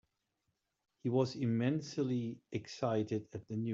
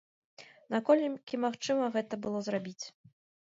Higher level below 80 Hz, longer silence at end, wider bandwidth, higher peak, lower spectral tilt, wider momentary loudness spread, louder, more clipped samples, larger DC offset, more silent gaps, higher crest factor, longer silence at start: about the same, -76 dBFS vs -80 dBFS; second, 0 s vs 0.55 s; about the same, 7.6 kHz vs 7.8 kHz; second, -18 dBFS vs -12 dBFS; first, -7.5 dB/octave vs -5 dB/octave; second, 9 LU vs 13 LU; second, -37 LUFS vs -32 LUFS; neither; neither; neither; about the same, 18 dB vs 20 dB; first, 1.05 s vs 0.4 s